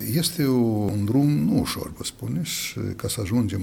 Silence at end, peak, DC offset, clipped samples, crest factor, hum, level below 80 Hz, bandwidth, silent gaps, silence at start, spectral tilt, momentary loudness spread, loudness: 0 s; -10 dBFS; under 0.1%; under 0.1%; 14 dB; none; -48 dBFS; 18 kHz; none; 0 s; -5.5 dB/octave; 9 LU; -24 LUFS